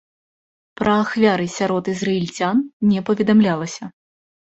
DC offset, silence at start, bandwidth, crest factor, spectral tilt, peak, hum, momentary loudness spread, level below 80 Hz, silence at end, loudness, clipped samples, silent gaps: under 0.1%; 0.8 s; 8 kHz; 18 dB; -6 dB/octave; -2 dBFS; none; 9 LU; -56 dBFS; 0.6 s; -19 LUFS; under 0.1%; 2.73-2.80 s